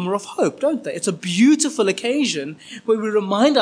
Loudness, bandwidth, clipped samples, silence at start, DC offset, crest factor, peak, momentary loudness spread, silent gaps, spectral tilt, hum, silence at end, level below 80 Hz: -19 LUFS; 10.5 kHz; under 0.1%; 0 s; under 0.1%; 14 dB; -4 dBFS; 9 LU; none; -4 dB/octave; none; 0 s; -74 dBFS